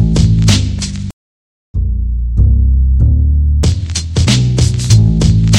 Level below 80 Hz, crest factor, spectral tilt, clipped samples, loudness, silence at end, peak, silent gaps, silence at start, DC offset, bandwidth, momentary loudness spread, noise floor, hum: -14 dBFS; 10 dB; -5.5 dB/octave; under 0.1%; -12 LUFS; 0 s; 0 dBFS; 1.13-1.74 s; 0 s; under 0.1%; 11.5 kHz; 10 LU; under -90 dBFS; none